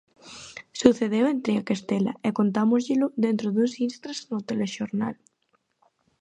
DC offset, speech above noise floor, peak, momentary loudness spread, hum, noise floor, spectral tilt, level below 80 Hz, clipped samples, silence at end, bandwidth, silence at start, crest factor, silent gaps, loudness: under 0.1%; 47 dB; -2 dBFS; 16 LU; none; -71 dBFS; -6 dB/octave; -64 dBFS; under 0.1%; 1.05 s; 9.4 kHz; 0.25 s; 24 dB; none; -25 LUFS